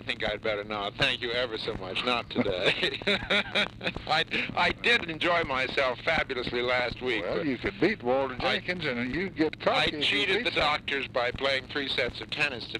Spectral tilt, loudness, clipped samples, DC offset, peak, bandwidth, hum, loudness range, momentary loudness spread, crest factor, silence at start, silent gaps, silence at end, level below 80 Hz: -4.5 dB/octave; -27 LUFS; under 0.1%; under 0.1%; -12 dBFS; 12.5 kHz; none; 2 LU; 6 LU; 18 dB; 0 s; none; 0 s; -52 dBFS